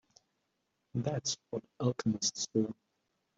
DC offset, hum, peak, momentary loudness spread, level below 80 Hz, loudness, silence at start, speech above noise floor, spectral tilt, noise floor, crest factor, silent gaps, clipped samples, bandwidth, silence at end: under 0.1%; none; -18 dBFS; 9 LU; -72 dBFS; -35 LUFS; 0.95 s; 47 dB; -4.5 dB/octave; -82 dBFS; 20 dB; none; under 0.1%; 8 kHz; 0.65 s